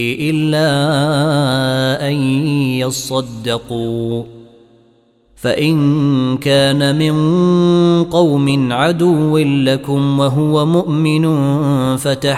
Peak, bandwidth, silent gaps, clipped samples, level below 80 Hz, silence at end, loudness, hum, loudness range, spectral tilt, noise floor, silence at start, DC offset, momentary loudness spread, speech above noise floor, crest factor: -2 dBFS; 15 kHz; none; under 0.1%; -48 dBFS; 0 s; -14 LUFS; none; 6 LU; -6 dB/octave; -53 dBFS; 0 s; under 0.1%; 7 LU; 39 dB; 12 dB